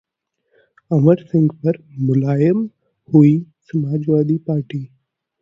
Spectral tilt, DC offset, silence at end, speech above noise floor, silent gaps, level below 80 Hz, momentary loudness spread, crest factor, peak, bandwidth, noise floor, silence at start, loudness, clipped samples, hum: -11 dB/octave; under 0.1%; 0.55 s; 55 dB; none; -56 dBFS; 12 LU; 18 dB; 0 dBFS; 5.4 kHz; -71 dBFS; 0.9 s; -17 LUFS; under 0.1%; none